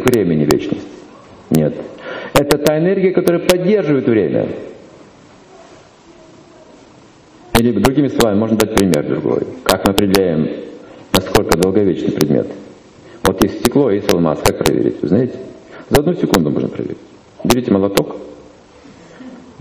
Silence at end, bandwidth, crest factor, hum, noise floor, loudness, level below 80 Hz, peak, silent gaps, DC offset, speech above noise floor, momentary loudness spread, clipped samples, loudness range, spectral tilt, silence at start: 0.1 s; 16 kHz; 16 dB; none; -44 dBFS; -15 LUFS; -36 dBFS; 0 dBFS; none; under 0.1%; 29 dB; 15 LU; under 0.1%; 5 LU; -5.5 dB/octave; 0 s